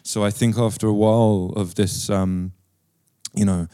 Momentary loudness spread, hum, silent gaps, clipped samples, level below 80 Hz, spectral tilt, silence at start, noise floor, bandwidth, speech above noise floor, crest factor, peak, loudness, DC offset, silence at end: 11 LU; none; none; under 0.1%; -52 dBFS; -6 dB/octave; 0.05 s; -67 dBFS; 15 kHz; 47 dB; 14 dB; -6 dBFS; -21 LUFS; under 0.1%; 0.05 s